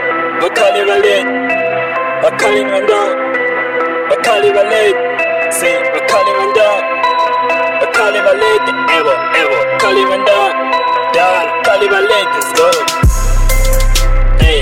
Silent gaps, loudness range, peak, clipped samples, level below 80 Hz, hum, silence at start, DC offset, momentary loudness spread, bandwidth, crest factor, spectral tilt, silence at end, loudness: none; 1 LU; 0 dBFS; under 0.1%; -18 dBFS; none; 0 s; under 0.1%; 4 LU; 16.5 kHz; 10 dB; -3.5 dB/octave; 0 s; -11 LUFS